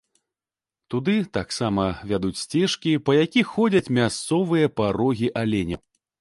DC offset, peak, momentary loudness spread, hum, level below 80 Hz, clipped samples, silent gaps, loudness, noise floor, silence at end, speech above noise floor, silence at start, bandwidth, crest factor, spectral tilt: under 0.1%; -6 dBFS; 6 LU; none; -50 dBFS; under 0.1%; none; -23 LUFS; under -90 dBFS; 0.45 s; over 68 dB; 0.9 s; 11.5 kHz; 16 dB; -5.5 dB/octave